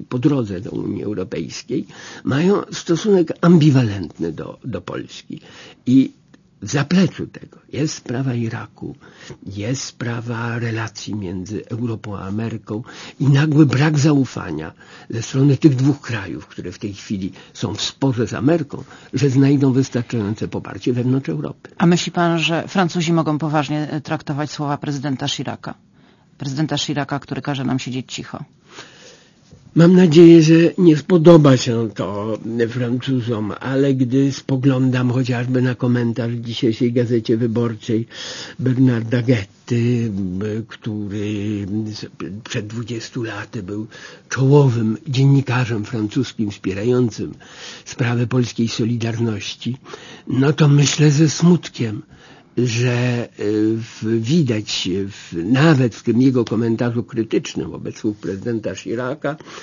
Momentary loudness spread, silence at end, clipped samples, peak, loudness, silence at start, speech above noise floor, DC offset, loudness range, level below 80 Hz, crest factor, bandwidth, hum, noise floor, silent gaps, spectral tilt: 16 LU; 0 s; under 0.1%; 0 dBFS; -18 LUFS; 0 s; 34 dB; under 0.1%; 10 LU; -56 dBFS; 18 dB; 7.4 kHz; none; -51 dBFS; none; -6.5 dB/octave